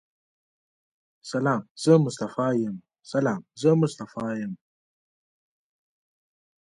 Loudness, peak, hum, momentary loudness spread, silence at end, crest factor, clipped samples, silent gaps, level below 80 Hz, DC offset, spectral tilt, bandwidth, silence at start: -25 LUFS; -6 dBFS; none; 14 LU; 2.15 s; 22 dB; under 0.1%; 1.71-1.75 s; -72 dBFS; under 0.1%; -7 dB/octave; 11 kHz; 1.25 s